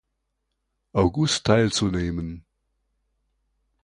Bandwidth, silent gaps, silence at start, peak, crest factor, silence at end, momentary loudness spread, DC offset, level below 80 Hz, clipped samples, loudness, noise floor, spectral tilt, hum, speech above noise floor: 11 kHz; none; 0.95 s; -4 dBFS; 22 dB; 1.45 s; 14 LU; under 0.1%; -44 dBFS; under 0.1%; -23 LUFS; -77 dBFS; -5 dB/octave; none; 55 dB